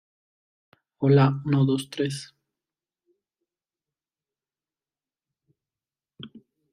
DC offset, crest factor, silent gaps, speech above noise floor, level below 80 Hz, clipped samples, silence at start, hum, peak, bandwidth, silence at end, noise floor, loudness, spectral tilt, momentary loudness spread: under 0.1%; 20 dB; none; over 68 dB; -66 dBFS; under 0.1%; 1 s; none; -8 dBFS; 11 kHz; 0.35 s; under -90 dBFS; -23 LUFS; -7.5 dB/octave; 26 LU